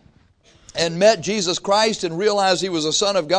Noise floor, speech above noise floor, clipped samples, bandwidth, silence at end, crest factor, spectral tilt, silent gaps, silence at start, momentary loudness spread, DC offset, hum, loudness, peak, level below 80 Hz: -54 dBFS; 36 dB; under 0.1%; 10.5 kHz; 0 s; 18 dB; -3 dB/octave; none; 0.75 s; 6 LU; under 0.1%; none; -19 LUFS; -2 dBFS; -56 dBFS